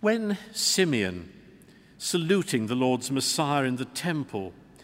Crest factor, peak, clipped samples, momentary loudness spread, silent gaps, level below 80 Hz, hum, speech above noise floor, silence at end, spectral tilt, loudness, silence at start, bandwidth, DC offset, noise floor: 18 dB; -10 dBFS; under 0.1%; 11 LU; none; -64 dBFS; none; 27 dB; 0.3 s; -4 dB/octave; -26 LUFS; 0 s; 16 kHz; under 0.1%; -53 dBFS